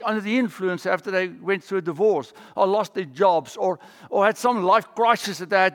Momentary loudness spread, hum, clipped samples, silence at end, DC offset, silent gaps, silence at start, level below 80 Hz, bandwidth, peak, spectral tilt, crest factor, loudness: 7 LU; none; under 0.1%; 0 s; under 0.1%; none; 0 s; -80 dBFS; 17 kHz; -4 dBFS; -5 dB/octave; 18 dB; -22 LUFS